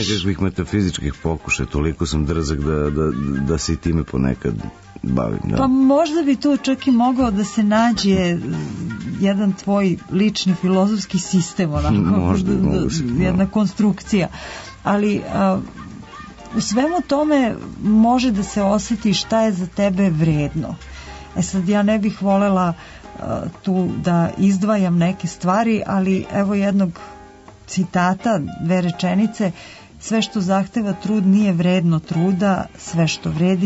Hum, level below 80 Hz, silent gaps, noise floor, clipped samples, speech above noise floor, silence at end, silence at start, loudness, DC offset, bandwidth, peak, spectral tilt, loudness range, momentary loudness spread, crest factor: none; -38 dBFS; none; -42 dBFS; under 0.1%; 24 dB; 0 s; 0 s; -19 LUFS; under 0.1%; 8 kHz; -6 dBFS; -6 dB/octave; 3 LU; 10 LU; 12 dB